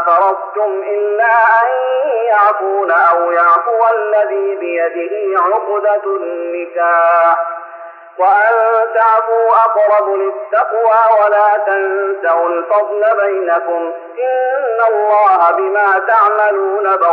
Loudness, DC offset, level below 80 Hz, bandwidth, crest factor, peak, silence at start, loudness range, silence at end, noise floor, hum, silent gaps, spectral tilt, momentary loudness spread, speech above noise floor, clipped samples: -12 LUFS; under 0.1%; -74 dBFS; 4.7 kHz; 10 dB; -2 dBFS; 0 s; 3 LU; 0 s; -33 dBFS; none; none; -4.5 dB/octave; 8 LU; 20 dB; under 0.1%